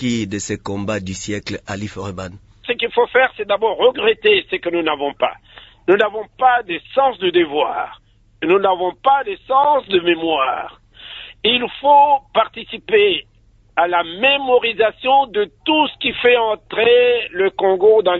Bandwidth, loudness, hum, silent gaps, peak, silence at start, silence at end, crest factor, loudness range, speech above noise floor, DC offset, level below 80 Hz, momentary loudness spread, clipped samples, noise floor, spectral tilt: 8 kHz; -17 LUFS; none; none; -2 dBFS; 0 s; 0 s; 16 dB; 3 LU; 20 dB; under 0.1%; -52 dBFS; 13 LU; under 0.1%; -37 dBFS; -4 dB/octave